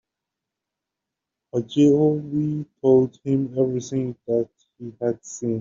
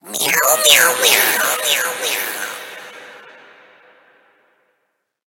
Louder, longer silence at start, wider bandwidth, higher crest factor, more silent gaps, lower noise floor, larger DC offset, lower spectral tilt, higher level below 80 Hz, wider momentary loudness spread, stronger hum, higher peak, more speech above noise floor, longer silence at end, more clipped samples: second, -22 LUFS vs -13 LUFS; first, 1.55 s vs 0.05 s; second, 7.6 kHz vs 19 kHz; about the same, 18 dB vs 18 dB; neither; first, -85 dBFS vs -70 dBFS; neither; first, -9 dB/octave vs 1.5 dB/octave; first, -62 dBFS vs -70 dBFS; second, 11 LU vs 21 LU; neither; second, -6 dBFS vs 0 dBFS; first, 64 dB vs 55 dB; second, 0 s vs 2.15 s; neither